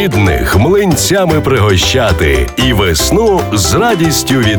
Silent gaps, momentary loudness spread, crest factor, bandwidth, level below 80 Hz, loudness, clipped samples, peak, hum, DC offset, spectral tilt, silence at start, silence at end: none; 2 LU; 10 dB; over 20 kHz; -22 dBFS; -10 LUFS; under 0.1%; 0 dBFS; none; under 0.1%; -4.5 dB/octave; 0 s; 0 s